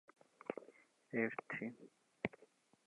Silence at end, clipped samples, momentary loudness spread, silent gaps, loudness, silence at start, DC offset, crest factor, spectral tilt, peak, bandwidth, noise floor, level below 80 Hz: 0.4 s; under 0.1%; 24 LU; none; -45 LUFS; 0.5 s; under 0.1%; 28 dB; -7 dB/octave; -20 dBFS; 11 kHz; -71 dBFS; -82 dBFS